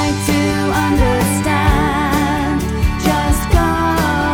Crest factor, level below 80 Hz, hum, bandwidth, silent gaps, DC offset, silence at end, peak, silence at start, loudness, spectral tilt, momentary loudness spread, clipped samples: 14 dB; -22 dBFS; none; over 20 kHz; none; under 0.1%; 0 s; 0 dBFS; 0 s; -15 LUFS; -5.5 dB/octave; 3 LU; under 0.1%